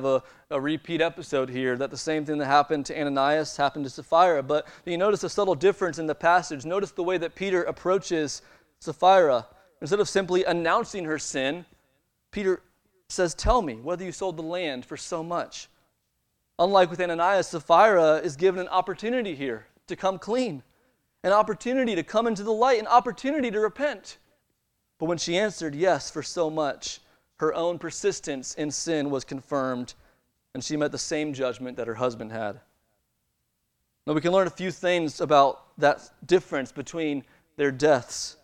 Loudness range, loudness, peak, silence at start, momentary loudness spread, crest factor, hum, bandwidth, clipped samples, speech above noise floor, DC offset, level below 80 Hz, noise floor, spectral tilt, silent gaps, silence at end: 7 LU; -25 LUFS; -6 dBFS; 0 s; 12 LU; 20 dB; none; 12 kHz; under 0.1%; 51 dB; under 0.1%; -50 dBFS; -76 dBFS; -4.5 dB/octave; none; 0.1 s